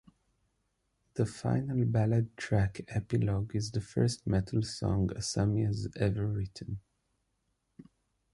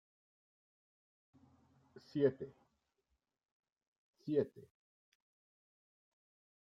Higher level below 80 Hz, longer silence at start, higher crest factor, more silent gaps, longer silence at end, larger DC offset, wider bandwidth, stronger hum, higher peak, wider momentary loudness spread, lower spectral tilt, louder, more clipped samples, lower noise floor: first, -50 dBFS vs -84 dBFS; second, 1.15 s vs 2.15 s; second, 18 dB vs 24 dB; second, none vs 3.51-3.60 s, 3.72-3.76 s, 3.87-4.13 s; second, 0.5 s vs 2.05 s; neither; first, 11.5 kHz vs 6 kHz; neither; first, -14 dBFS vs -20 dBFS; second, 8 LU vs 16 LU; second, -6.5 dB/octave vs -9 dB/octave; first, -32 LUFS vs -38 LUFS; neither; second, -79 dBFS vs -86 dBFS